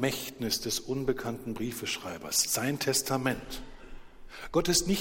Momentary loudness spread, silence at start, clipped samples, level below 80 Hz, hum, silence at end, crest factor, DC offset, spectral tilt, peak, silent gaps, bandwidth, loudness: 15 LU; 0 s; under 0.1%; -50 dBFS; none; 0 s; 20 dB; under 0.1%; -3 dB/octave; -12 dBFS; none; 16.5 kHz; -30 LUFS